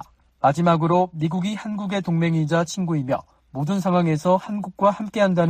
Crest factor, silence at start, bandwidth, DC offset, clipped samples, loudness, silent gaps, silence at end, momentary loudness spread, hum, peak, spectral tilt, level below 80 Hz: 16 dB; 0 s; 9.8 kHz; under 0.1%; under 0.1%; -22 LUFS; none; 0 s; 8 LU; none; -6 dBFS; -7 dB/octave; -58 dBFS